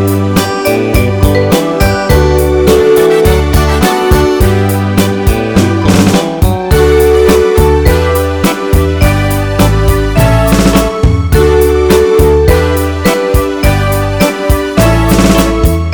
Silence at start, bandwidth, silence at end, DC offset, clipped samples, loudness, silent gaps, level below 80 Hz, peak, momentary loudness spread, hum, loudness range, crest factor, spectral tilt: 0 s; over 20 kHz; 0 s; under 0.1%; 1%; -9 LUFS; none; -14 dBFS; 0 dBFS; 4 LU; none; 1 LU; 8 dB; -6 dB/octave